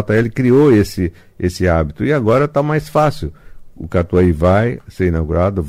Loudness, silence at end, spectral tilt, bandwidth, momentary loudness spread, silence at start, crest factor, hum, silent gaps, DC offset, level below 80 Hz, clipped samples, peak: -15 LUFS; 0 s; -8 dB/octave; 15.5 kHz; 11 LU; 0 s; 12 dB; none; none; under 0.1%; -32 dBFS; under 0.1%; -2 dBFS